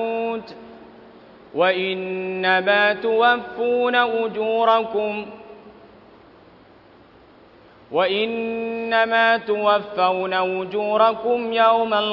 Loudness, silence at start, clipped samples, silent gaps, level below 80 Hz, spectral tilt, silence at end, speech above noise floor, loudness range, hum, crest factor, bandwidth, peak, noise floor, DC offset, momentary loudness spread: -20 LUFS; 0 s; under 0.1%; none; -64 dBFS; -6.5 dB/octave; 0 s; 30 dB; 9 LU; none; 18 dB; 6 kHz; -4 dBFS; -49 dBFS; under 0.1%; 10 LU